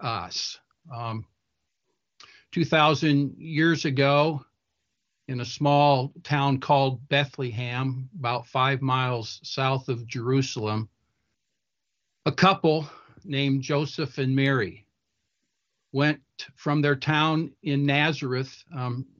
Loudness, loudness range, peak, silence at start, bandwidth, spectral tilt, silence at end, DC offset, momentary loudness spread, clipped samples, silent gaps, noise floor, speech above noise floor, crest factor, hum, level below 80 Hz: -25 LUFS; 4 LU; -6 dBFS; 0 s; 7.2 kHz; -6 dB/octave; 0.15 s; under 0.1%; 13 LU; under 0.1%; none; -83 dBFS; 58 dB; 20 dB; none; -66 dBFS